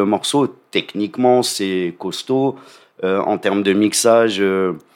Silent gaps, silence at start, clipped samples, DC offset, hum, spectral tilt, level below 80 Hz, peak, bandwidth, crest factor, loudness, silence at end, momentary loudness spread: none; 0 s; under 0.1%; under 0.1%; none; -4 dB/octave; -72 dBFS; -2 dBFS; 16.5 kHz; 16 dB; -17 LUFS; 0.15 s; 10 LU